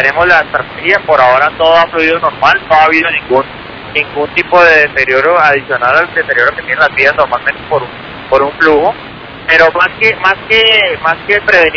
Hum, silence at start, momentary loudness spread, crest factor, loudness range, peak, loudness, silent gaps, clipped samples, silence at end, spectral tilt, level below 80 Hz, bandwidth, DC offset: none; 0 s; 9 LU; 10 dB; 2 LU; 0 dBFS; -9 LUFS; none; 3%; 0 s; -4.5 dB/octave; -40 dBFS; 5.4 kHz; under 0.1%